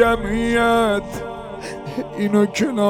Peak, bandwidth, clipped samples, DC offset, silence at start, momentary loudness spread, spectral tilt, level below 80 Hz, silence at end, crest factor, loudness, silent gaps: -2 dBFS; 16 kHz; under 0.1%; under 0.1%; 0 s; 14 LU; -5.5 dB/octave; -38 dBFS; 0 s; 16 dB; -19 LUFS; none